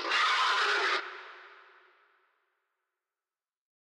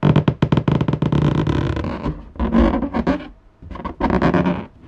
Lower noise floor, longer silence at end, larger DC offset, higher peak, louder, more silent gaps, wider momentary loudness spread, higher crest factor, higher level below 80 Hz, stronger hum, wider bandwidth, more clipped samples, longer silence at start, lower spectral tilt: first, under -90 dBFS vs -38 dBFS; first, 2.45 s vs 0 s; neither; second, -18 dBFS vs -2 dBFS; second, -27 LUFS vs -19 LUFS; neither; first, 20 LU vs 11 LU; about the same, 16 dB vs 16 dB; second, under -90 dBFS vs -30 dBFS; neither; first, 13.5 kHz vs 7.6 kHz; neither; about the same, 0 s vs 0 s; second, 3 dB/octave vs -9 dB/octave